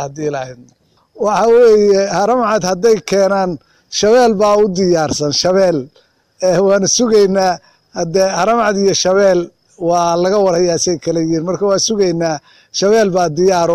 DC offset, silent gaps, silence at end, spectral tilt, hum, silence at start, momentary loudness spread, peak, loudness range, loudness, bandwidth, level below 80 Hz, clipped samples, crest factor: under 0.1%; none; 0 s; -4 dB/octave; none; 0 s; 11 LU; -4 dBFS; 2 LU; -13 LUFS; 14 kHz; -48 dBFS; under 0.1%; 10 dB